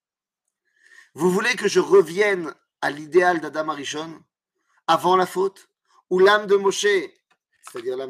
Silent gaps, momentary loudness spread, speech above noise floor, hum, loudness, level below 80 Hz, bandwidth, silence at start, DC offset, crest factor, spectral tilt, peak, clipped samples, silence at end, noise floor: none; 15 LU; 63 dB; none; -20 LUFS; -76 dBFS; 15 kHz; 1.15 s; under 0.1%; 18 dB; -4 dB/octave; -4 dBFS; under 0.1%; 0 s; -83 dBFS